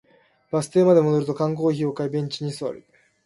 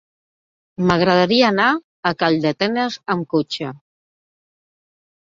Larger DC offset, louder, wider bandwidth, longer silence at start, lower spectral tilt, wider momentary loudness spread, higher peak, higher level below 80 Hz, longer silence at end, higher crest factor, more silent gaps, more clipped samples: neither; second, -22 LUFS vs -18 LUFS; first, 11.5 kHz vs 7.6 kHz; second, 0.55 s vs 0.8 s; about the same, -7 dB/octave vs -6 dB/octave; first, 13 LU vs 9 LU; second, -6 dBFS vs -2 dBFS; second, -66 dBFS vs -54 dBFS; second, 0.45 s vs 1.45 s; about the same, 18 dB vs 18 dB; second, none vs 1.84-2.03 s; neither